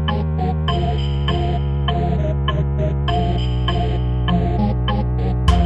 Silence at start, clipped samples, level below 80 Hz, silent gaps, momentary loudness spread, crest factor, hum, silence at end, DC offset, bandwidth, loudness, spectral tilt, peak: 0 s; under 0.1%; -22 dBFS; none; 2 LU; 16 dB; none; 0 s; under 0.1%; 8 kHz; -20 LUFS; -8 dB/octave; -2 dBFS